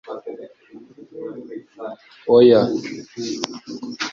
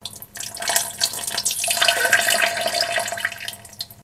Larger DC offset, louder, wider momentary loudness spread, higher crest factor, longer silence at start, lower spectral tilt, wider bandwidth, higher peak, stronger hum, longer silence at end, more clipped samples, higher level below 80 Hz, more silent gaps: neither; about the same, -17 LUFS vs -19 LUFS; first, 23 LU vs 16 LU; about the same, 18 dB vs 22 dB; about the same, 0.05 s vs 0 s; first, -5.5 dB/octave vs 1 dB/octave; second, 7.4 kHz vs 16 kHz; about the same, -2 dBFS vs -2 dBFS; neither; about the same, 0 s vs 0 s; neither; about the same, -62 dBFS vs -60 dBFS; neither